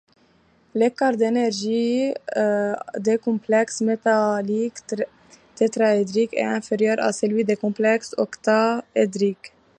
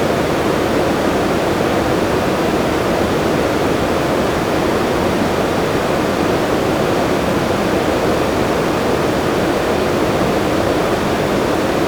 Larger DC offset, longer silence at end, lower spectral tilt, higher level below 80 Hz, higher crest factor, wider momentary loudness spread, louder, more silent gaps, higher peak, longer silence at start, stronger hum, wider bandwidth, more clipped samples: neither; first, 0.3 s vs 0 s; about the same, -5 dB/octave vs -5.5 dB/octave; second, -70 dBFS vs -34 dBFS; about the same, 16 dB vs 12 dB; first, 6 LU vs 1 LU; second, -22 LUFS vs -16 LUFS; neither; second, -6 dBFS vs -2 dBFS; first, 0.75 s vs 0 s; neither; second, 10 kHz vs over 20 kHz; neither